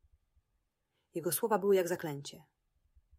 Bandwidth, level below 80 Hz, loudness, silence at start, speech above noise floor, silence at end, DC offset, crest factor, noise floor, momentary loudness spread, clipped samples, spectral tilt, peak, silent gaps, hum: 16 kHz; -74 dBFS; -32 LUFS; 1.15 s; 49 dB; 0.8 s; under 0.1%; 20 dB; -82 dBFS; 16 LU; under 0.1%; -4.5 dB/octave; -18 dBFS; none; none